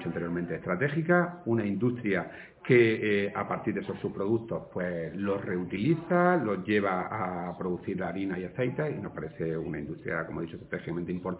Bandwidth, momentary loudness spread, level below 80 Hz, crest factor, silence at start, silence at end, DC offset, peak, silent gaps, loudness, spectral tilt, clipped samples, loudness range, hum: 4 kHz; 11 LU; -58 dBFS; 20 dB; 0 s; 0 s; under 0.1%; -10 dBFS; none; -30 LUFS; -6.5 dB/octave; under 0.1%; 6 LU; none